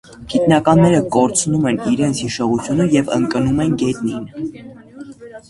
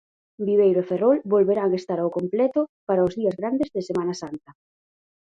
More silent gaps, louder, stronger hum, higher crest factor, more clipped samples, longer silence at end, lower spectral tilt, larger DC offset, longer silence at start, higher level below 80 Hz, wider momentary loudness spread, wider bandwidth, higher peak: second, none vs 2.69-2.87 s; first, -16 LUFS vs -23 LUFS; neither; about the same, 16 dB vs 16 dB; neither; second, 0.1 s vs 0.85 s; second, -5.5 dB/octave vs -7.5 dB/octave; neither; second, 0.1 s vs 0.4 s; first, -44 dBFS vs -62 dBFS; first, 16 LU vs 9 LU; first, 11.5 kHz vs 7.8 kHz; first, 0 dBFS vs -8 dBFS